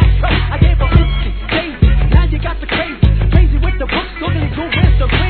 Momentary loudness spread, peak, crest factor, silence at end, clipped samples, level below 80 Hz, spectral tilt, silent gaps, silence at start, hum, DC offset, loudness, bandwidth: 6 LU; 0 dBFS; 12 dB; 0 s; 0.2%; -14 dBFS; -10 dB/octave; none; 0 s; none; 0.3%; -14 LUFS; 4.5 kHz